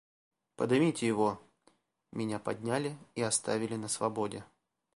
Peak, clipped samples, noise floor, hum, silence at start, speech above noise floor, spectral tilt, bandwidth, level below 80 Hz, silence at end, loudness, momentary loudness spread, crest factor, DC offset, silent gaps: -16 dBFS; under 0.1%; -70 dBFS; none; 0.6 s; 38 dB; -4.5 dB/octave; 11.5 kHz; -72 dBFS; 0.5 s; -33 LUFS; 10 LU; 18 dB; under 0.1%; none